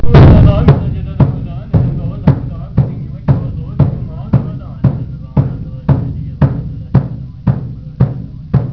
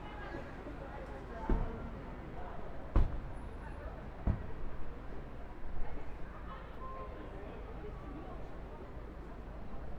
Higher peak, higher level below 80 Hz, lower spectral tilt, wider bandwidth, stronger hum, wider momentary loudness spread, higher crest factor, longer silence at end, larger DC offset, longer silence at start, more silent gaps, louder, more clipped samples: first, 0 dBFS vs -16 dBFS; first, -20 dBFS vs -42 dBFS; first, -11 dB/octave vs -8.5 dB/octave; about the same, 5.4 kHz vs 5.6 kHz; neither; about the same, 13 LU vs 11 LU; second, 12 dB vs 22 dB; about the same, 0 s vs 0 s; neither; about the same, 0 s vs 0 s; neither; first, -14 LUFS vs -45 LUFS; first, 0.9% vs under 0.1%